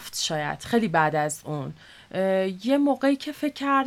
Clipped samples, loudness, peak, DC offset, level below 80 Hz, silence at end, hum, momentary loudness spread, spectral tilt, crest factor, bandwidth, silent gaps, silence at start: under 0.1%; -25 LUFS; -6 dBFS; under 0.1%; -62 dBFS; 0 s; none; 11 LU; -4.5 dB/octave; 18 dB; 16 kHz; none; 0 s